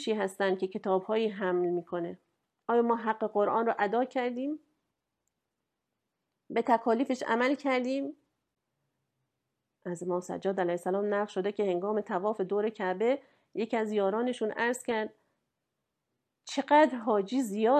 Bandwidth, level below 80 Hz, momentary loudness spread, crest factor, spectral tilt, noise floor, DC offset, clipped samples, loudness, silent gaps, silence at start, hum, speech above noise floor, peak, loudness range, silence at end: 13.5 kHz; -82 dBFS; 10 LU; 20 dB; -5.5 dB/octave; -85 dBFS; under 0.1%; under 0.1%; -30 LUFS; none; 0 s; none; 56 dB; -12 dBFS; 4 LU; 0 s